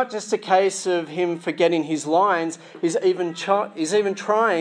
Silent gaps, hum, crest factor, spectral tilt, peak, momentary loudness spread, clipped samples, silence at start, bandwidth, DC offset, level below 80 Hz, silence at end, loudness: none; none; 16 dB; -4 dB/octave; -4 dBFS; 6 LU; under 0.1%; 0 s; 10.5 kHz; under 0.1%; -82 dBFS; 0 s; -22 LUFS